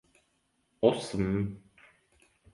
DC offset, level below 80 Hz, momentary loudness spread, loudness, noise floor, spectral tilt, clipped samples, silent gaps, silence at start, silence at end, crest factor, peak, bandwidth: under 0.1%; -56 dBFS; 10 LU; -30 LUFS; -74 dBFS; -6.5 dB/octave; under 0.1%; none; 0.8 s; 0.95 s; 24 dB; -10 dBFS; 11.5 kHz